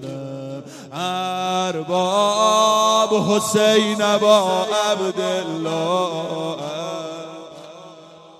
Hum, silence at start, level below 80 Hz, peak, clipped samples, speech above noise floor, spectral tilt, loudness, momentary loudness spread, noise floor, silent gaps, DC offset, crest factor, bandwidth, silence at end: none; 0 s; -68 dBFS; -2 dBFS; under 0.1%; 24 dB; -3.5 dB/octave; -19 LUFS; 18 LU; -43 dBFS; none; under 0.1%; 18 dB; 14.5 kHz; 0.1 s